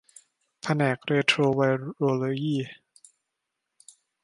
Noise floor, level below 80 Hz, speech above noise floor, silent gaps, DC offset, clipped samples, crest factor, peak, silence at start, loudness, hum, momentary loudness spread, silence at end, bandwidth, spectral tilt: -83 dBFS; -70 dBFS; 58 dB; none; under 0.1%; under 0.1%; 22 dB; -6 dBFS; 0.65 s; -25 LUFS; none; 9 LU; 1.5 s; 11.5 kHz; -6 dB/octave